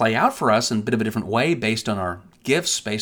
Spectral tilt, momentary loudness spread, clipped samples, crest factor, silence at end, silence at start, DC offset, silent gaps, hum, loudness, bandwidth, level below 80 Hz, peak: -4 dB/octave; 7 LU; under 0.1%; 16 dB; 0 s; 0 s; under 0.1%; none; none; -21 LUFS; 19.5 kHz; -56 dBFS; -4 dBFS